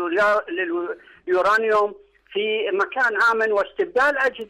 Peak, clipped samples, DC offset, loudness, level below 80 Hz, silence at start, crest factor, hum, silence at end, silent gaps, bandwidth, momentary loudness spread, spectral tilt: -12 dBFS; under 0.1%; under 0.1%; -21 LUFS; -62 dBFS; 0 s; 10 dB; none; 0.05 s; none; 13 kHz; 9 LU; -3.5 dB/octave